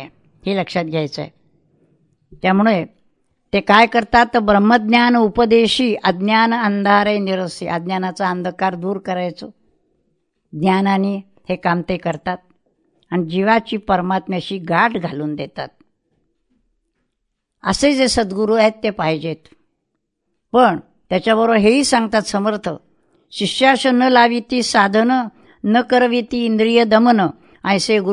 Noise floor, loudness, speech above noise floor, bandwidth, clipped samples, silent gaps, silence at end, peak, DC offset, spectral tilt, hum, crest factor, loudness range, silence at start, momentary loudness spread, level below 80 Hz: -74 dBFS; -16 LUFS; 58 dB; 11 kHz; under 0.1%; none; 0 s; 0 dBFS; under 0.1%; -5 dB/octave; none; 18 dB; 7 LU; 0 s; 13 LU; -48 dBFS